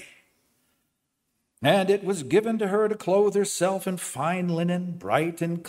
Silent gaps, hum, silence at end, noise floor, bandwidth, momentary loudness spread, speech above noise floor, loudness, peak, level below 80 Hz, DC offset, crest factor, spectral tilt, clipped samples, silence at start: none; none; 0 s; -77 dBFS; 16 kHz; 6 LU; 53 dB; -25 LUFS; -6 dBFS; -70 dBFS; under 0.1%; 20 dB; -5 dB/octave; under 0.1%; 0 s